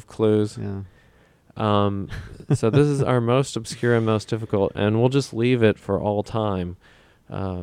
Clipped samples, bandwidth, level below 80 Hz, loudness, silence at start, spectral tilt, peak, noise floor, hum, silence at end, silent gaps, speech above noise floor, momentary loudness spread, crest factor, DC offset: under 0.1%; 12.5 kHz; -50 dBFS; -22 LUFS; 0.1 s; -7 dB/octave; -4 dBFS; -56 dBFS; none; 0 s; none; 34 dB; 13 LU; 18 dB; under 0.1%